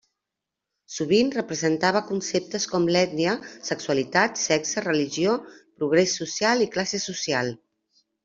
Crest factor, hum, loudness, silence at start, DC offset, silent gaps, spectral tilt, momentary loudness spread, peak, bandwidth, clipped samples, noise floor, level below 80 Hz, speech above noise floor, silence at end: 20 dB; none; -24 LUFS; 0.9 s; under 0.1%; none; -3.5 dB/octave; 9 LU; -4 dBFS; 8 kHz; under 0.1%; -85 dBFS; -64 dBFS; 62 dB; 0.7 s